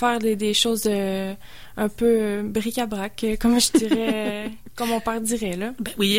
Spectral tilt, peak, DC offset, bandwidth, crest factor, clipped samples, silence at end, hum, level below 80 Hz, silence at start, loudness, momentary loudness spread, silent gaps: -3.5 dB/octave; -6 dBFS; 0.9%; 16.5 kHz; 18 dB; under 0.1%; 0 s; none; -44 dBFS; 0 s; -23 LUFS; 11 LU; none